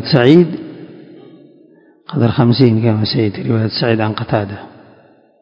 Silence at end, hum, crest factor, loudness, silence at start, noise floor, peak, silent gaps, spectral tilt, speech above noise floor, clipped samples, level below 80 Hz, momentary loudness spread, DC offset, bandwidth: 0.75 s; none; 16 dB; -14 LUFS; 0 s; -48 dBFS; 0 dBFS; none; -9 dB/octave; 35 dB; 0.3%; -48 dBFS; 17 LU; under 0.1%; 5.6 kHz